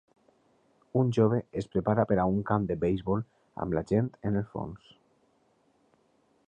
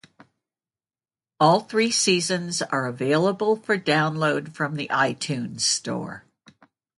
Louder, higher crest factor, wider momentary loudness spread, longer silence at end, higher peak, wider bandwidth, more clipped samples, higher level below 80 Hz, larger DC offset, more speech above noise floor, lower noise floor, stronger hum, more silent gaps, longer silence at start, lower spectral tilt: second, -29 LUFS vs -23 LUFS; about the same, 18 dB vs 18 dB; first, 12 LU vs 9 LU; first, 1.7 s vs 0.8 s; second, -12 dBFS vs -6 dBFS; second, 8.8 kHz vs 11.5 kHz; neither; first, -54 dBFS vs -68 dBFS; neither; second, 40 dB vs over 67 dB; second, -68 dBFS vs under -90 dBFS; neither; neither; second, 0.95 s vs 1.4 s; first, -9 dB/octave vs -3.5 dB/octave